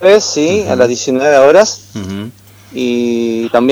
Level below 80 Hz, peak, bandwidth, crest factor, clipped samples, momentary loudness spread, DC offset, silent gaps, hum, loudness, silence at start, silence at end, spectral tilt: -52 dBFS; 0 dBFS; 16.5 kHz; 12 dB; 0.4%; 16 LU; under 0.1%; none; none; -11 LUFS; 0 s; 0 s; -4 dB/octave